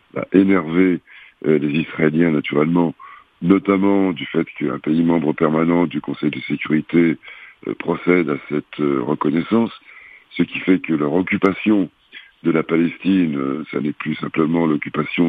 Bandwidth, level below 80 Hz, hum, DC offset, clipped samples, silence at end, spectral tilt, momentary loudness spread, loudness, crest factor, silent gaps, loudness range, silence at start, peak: 4.7 kHz; -58 dBFS; none; under 0.1%; under 0.1%; 0 s; -9.5 dB/octave; 9 LU; -19 LUFS; 18 dB; none; 2 LU; 0.15 s; 0 dBFS